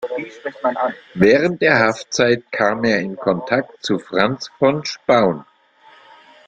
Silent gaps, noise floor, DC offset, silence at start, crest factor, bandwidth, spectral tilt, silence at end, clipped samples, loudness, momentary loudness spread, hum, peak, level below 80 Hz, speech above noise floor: none; -50 dBFS; under 0.1%; 0 s; 18 dB; 9 kHz; -5 dB/octave; 1.05 s; under 0.1%; -18 LUFS; 9 LU; none; 0 dBFS; -56 dBFS; 32 dB